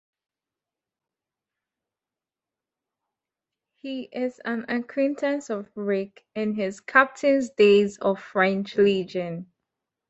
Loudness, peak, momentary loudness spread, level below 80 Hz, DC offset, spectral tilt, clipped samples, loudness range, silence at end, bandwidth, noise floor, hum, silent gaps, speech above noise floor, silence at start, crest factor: -24 LUFS; -2 dBFS; 14 LU; -70 dBFS; under 0.1%; -5.5 dB/octave; under 0.1%; 14 LU; 0.65 s; 8.2 kHz; under -90 dBFS; none; none; over 66 dB; 3.85 s; 24 dB